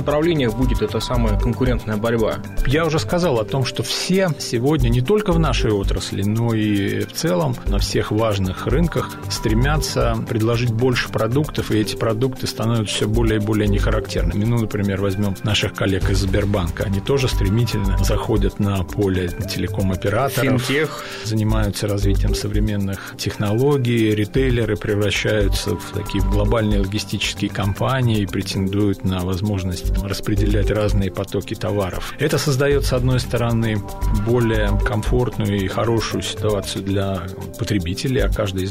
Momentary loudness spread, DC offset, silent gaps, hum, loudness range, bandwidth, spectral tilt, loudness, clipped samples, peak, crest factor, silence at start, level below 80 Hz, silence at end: 5 LU; 0.4%; none; none; 2 LU; 16 kHz; -6 dB/octave; -20 LUFS; under 0.1%; -8 dBFS; 12 dB; 0 s; -26 dBFS; 0 s